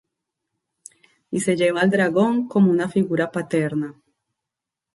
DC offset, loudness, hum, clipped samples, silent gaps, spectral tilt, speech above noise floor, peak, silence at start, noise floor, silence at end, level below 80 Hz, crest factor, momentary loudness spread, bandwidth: under 0.1%; -20 LUFS; none; under 0.1%; none; -6 dB/octave; 66 dB; -6 dBFS; 1.3 s; -86 dBFS; 1.05 s; -66 dBFS; 16 dB; 8 LU; 11.5 kHz